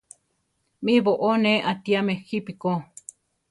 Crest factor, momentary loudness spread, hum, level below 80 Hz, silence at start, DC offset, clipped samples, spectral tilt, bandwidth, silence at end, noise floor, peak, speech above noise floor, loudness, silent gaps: 18 dB; 17 LU; none; -68 dBFS; 0.8 s; under 0.1%; under 0.1%; -6 dB/octave; 11.5 kHz; 0.65 s; -73 dBFS; -6 dBFS; 50 dB; -23 LUFS; none